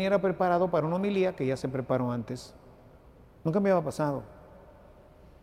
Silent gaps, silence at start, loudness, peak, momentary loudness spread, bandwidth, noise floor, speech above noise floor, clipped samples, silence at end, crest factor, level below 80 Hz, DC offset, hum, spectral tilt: none; 0 s; -29 LUFS; -12 dBFS; 13 LU; 15 kHz; -54 dBFS; 27 dB; under 0.1%; 0.8 s; 16 dB; -58 dBFS; under 0.1%; none; -7.5 dB/octave